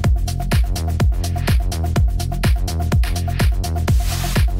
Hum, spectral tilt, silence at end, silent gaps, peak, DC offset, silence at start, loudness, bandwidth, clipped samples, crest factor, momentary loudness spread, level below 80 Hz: none; -5.5 dB/octave; 0 s; none; -6 dBFS; under 0.1%; 0 s; -20 LUFS; 16.5 kHz; under 0.1%; 10 dB; 2 LU; -20 dBFS